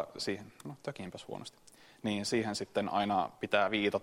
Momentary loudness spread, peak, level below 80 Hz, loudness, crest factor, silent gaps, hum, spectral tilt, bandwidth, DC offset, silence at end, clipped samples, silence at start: 15 LU; -12 dBFS; -70 dBFS; -34 LUFS; 24 dB; none; none; -4.5 dB/octave; 16 kHz; under 0.1%; 0 s; under 0.1%; 0 s